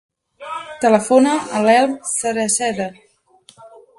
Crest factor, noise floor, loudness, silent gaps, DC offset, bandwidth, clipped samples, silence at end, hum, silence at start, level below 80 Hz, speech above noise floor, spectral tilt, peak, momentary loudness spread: 18 dB; -51 dBFS; -16 LUFS; none; under 0.1%; 12 kHz; under 0.1%; 0.3 s; none; 0.4 s; -62 dBFS; 36 dB; -3.5 dB/octave; 0 dBFS; 16 LU